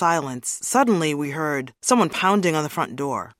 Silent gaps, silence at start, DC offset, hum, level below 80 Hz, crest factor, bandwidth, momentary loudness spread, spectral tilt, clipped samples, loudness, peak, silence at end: none; 0 s; under 0.1%; none; -66 dBFS; 18 dB; 16.5 kHz; 8 LU; -4 dB/octave; under 0.1%; -22 LUFS; -4 dBFS; 0.1 s